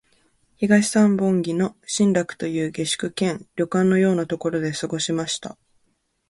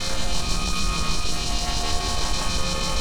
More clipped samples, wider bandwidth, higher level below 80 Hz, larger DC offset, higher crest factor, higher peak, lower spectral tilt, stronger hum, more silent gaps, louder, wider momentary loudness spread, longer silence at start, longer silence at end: neither; second, 11.5 kHz vs 18.5 kHz; second, -62 dBFS vs -28 dBFS; second, under 0.1% vs 5%; about the same, 18 dB vs 14 dB; first, -4 dBFS vs -10 dBFS; first, -5 dB/octave vs -2.5 dB/octave; neither; neither; first, -22 LUFS vs -25 LUFS; first, 9 LU vs 1 LU; first, 0.6 s vs 0 s; first, 0.75 s vs 0 s